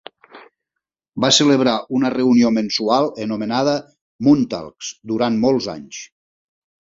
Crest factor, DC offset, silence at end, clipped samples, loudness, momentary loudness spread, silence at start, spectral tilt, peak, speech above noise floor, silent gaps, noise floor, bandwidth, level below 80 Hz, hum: 18 dB; under 0.1%; 0.8 s; under 0.1%; -17 LUFS; 17 LU; 0.35 s; -4.5 dB/octave; 0 dBFS; 65 dB; 4.02-4.19 s; -82 dBFS; 7.8 kHz; -58 dBFS; none